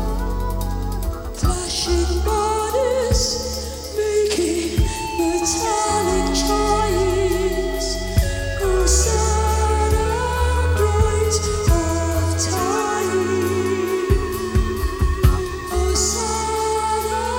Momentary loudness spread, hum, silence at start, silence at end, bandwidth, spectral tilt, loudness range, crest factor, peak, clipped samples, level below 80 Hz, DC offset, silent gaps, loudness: 6 LU; none; 0 s; 0 s; 17.5 kHz; -4.5 dB/octave; 2 LU; 18 dB; -2 dBFS; under 0.1%; -24 dBFS; under 0.1%; none; -20 LUFS